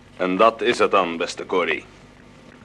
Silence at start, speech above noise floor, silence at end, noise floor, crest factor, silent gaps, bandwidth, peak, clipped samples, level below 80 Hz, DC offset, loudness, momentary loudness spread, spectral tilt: 0.2 s; 26 dB; 0.8 s; -47 dBFS; 20 dB; none; 11.5 kHz; -2 dBFS; under 0.1%; -58 dBFS; under 0.1%; -20 LUFS; 8 LU; -4 dB/octave